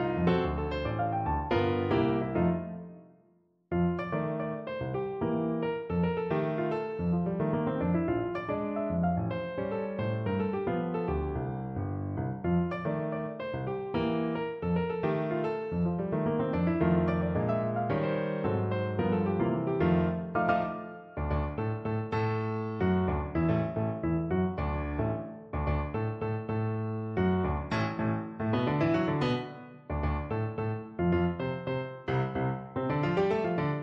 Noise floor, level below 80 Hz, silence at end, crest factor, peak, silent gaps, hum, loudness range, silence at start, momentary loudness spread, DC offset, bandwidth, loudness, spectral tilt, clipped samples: -67 dBFS; -46 dBFS; 0 s; 16 dB; -14 dBFS; none; none; 3 LU; 0 s; 7 LU; under 0.1%; 6 kHz; -31 LUFS; -9.5 dB/octave; under 0.1%